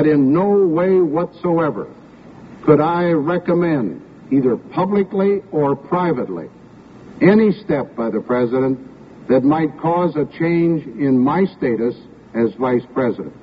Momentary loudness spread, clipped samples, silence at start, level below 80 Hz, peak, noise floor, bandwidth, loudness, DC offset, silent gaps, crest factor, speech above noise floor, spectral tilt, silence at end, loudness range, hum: 9 LU; under 0.1%; 0 s; -54 dBFS; 0 dBFS; -41 dBFS; 5.4 kHz; -17 LUFS; under 0.1%; none; 18 dB; 25 dB; -7.5 dB/octave; 0.05 s; 2 LU; none